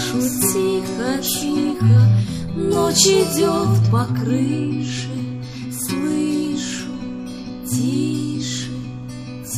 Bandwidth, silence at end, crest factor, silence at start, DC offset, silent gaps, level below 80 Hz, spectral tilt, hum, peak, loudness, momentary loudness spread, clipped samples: 15.5 kHz; 0 s; 18 dB; 0 s; under 0.1%; none; -46 dBFS; -5 dB/octave; none; -2 dBFS; -19 LUFS; 16 LU; under 0.1%